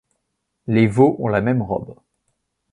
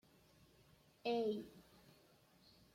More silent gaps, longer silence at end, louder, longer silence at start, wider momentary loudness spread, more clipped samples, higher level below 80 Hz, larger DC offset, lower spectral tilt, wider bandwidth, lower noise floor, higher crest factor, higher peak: neither; second, 0.8 s vs 1.15 s; first, -18 LUFS vs -43 LUFS; second, 0.65 s vs 1.05 s; second, 17 LU vs 26 LU; neither; first, -50 dBFS vs -80 dBFS; neither; first, -8.5 dB/octave vs -6 dB/octave; second, 11 kHz vs 16.5 kHz; first, -75 dBFS vs -70 dBFS; about the same, 18 dB vs 20 dB; first, -2 dBFS vs -28 dBFS